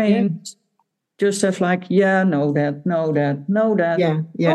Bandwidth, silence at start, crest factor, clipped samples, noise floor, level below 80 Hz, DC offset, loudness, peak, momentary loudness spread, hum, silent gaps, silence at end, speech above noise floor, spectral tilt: 12.5 kHz; 0 s; 14 dB; under 0.1%; -70 dBFS; -72 dBFS; under 0.1%; -19 LUFS; -4 dBFS; 5 LU; none; none; 0 s; 52 dB; -6.5 dB/octave